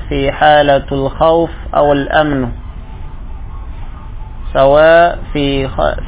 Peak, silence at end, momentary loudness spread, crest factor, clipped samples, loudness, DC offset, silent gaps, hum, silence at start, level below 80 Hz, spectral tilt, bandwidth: 0 dBFS; 0 s; 23 LU; 12 dB; 0.3%; -11 LUFS; under 0.1%; none; none; 0 s; -26 dBFS; -9.5 dB/octave; 4 kHz